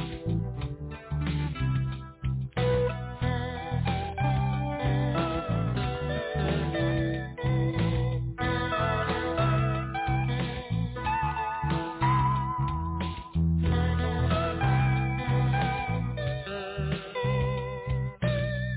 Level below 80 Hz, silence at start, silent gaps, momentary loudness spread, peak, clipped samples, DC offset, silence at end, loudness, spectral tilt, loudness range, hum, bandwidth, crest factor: -38 dBFS; 0 s; none; 6 LU; -16 dBFS; under 0.1%; under 0.1%; 0 s; -29 LUFS; -11 dB/octave; 3 LU; none; 4 kHz; 12 dB